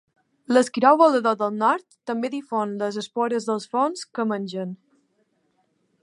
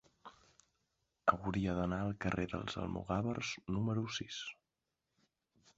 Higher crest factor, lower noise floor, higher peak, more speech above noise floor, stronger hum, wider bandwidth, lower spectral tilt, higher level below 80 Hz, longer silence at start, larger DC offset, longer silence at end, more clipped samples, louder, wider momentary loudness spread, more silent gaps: about the same, 22 dB vs 26 dB; second, -69 dBFS vs -88 dBFS; first, -2 dBFS vs -14 dBFS; about the same, 47 dB vs 50 dB; neither; first, 11.5 kHz vs 8 kHz; about the same, -5 dB/octave vs -5 dB/octave; second, -78 dBFS vs -58 dBFS; first, 0.5 s vs 0.25 s; neither; about the same, 1.3 s vs 1.25 s; neither; first, -23 LUFS vs -38 LUFS; first, 13 LU vs 8 LU; neither